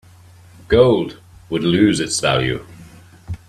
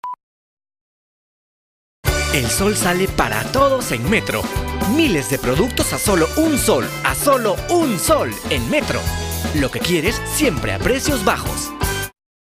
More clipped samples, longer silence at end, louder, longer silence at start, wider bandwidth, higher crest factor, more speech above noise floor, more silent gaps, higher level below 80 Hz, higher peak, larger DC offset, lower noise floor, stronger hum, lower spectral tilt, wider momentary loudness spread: neither; second, 0.15 s vs 0.4 s; about the same, -17 LUFS vs -18 LUFS; first, 0.7 s vs 0.05 s; second, 13.5 kHz vs 16 kHz; about the same, 18 dB vs 18 dB; second, 29 dB vs over 72 dB; second, none vs 0.23-0.57 s, 0.81-2.03 s; second, -42 dBFS vs -32 dBFS; about the same, 0 dBFS vs -2 dBFS; neither; second, -45 dBFS vs under -90 dBFS; neither; about the same, -5 dB/octave vs -4 dB/octave; first, 15 LU vs 6 LU